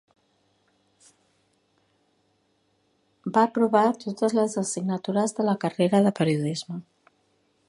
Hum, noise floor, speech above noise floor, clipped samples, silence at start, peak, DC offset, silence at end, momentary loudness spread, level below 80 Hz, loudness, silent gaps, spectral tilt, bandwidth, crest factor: none; -69 dBFS; 46 dB; under 0.1%; 3.25 s; -6 dBFS; under 0.1%; 0.85 s; 10 LU; -72 dBFS; -24 LUFS; none; -6 dB/octave; 11.5 kHz; 20 dB